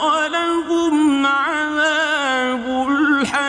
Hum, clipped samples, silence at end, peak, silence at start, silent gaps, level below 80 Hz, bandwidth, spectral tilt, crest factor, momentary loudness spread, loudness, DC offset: none; under 0.1%; 0 s; -6 dBFS; 0 s; none; -54 dBFS; 10 kHz; -2.5 dB/octave; 12 dB; 4 LU; -17 LUFS; under 0.1%